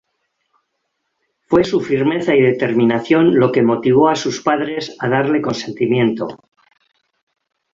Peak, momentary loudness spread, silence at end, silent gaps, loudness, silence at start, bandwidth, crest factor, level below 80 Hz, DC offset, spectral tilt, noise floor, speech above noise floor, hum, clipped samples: -2 dBFS; 7 LU; 1.4 s; none; -16 LUFS; 1.5 s; 7.6 kHz; 16 dB; -54 dBFS; under 0.1%; -6.5 dB/octave; -72 dBFS; 57 dB; none; under 0.1%